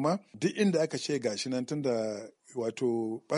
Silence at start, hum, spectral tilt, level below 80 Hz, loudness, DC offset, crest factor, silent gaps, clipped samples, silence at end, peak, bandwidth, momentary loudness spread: 0 s; none; -5.5 dB/octave; -76 dBFS; -31 LUFS; under 0.1%; 18 dB; none; under 0.1%; 0 s; -14 dBFS; 11.5 kHz; 9 LU